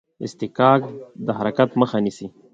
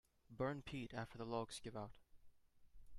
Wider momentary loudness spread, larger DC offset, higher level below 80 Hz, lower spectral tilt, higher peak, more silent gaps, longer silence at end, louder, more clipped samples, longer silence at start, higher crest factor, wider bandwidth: first, 17 LU vs 9 LU; neither; first, -62 dBFS vs -68 dBFS; first, -7 dB/octave vs -5.5 dB/octave; first, 0 dBFS vs -30 dBFS; neither; first, 0.25 s vs 0 s; first, -20 LUFS vs -48 LUFS; neither; about the same, 0.2 s vs 0.3 s; about the same, 20 dB vs 20 dB; second, 7.8 kHz vs 13.5 kHz